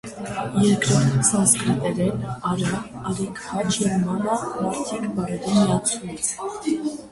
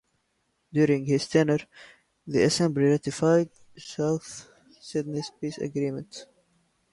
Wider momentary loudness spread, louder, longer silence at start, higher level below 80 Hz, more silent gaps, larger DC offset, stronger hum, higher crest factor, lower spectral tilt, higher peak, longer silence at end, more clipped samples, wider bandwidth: second, 10 LU vs 17 LU; first, -22 LUFS vs -26 LUFS; second, 0.05 s vs 0.75 s; first, -50 dBFS vs -64 dBFS; neither; neither; neither; about the same, 18 dB vs 18 dB; about the same, -4.5 dB/octave vs -5.5 dB/octave; first, -4 dBFS vs -10 dBFS; second, 0 s vs 0.7 s; neither; about the same, 11.5 kHz vs 11.5 kHz